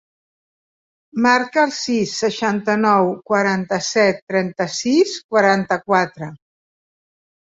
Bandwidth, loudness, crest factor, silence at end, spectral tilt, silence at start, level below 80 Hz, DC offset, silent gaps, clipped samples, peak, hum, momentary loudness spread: 8 kHz; -18 LUFS; 18 dB; 1.2 s; -4.5 dB/octave; 1.15 s; -64 dBFS; under 0.1%; 4.22-4.27 s, 5.24-5.29 s; under 0.1%; -2 dBFS; none; 6 LU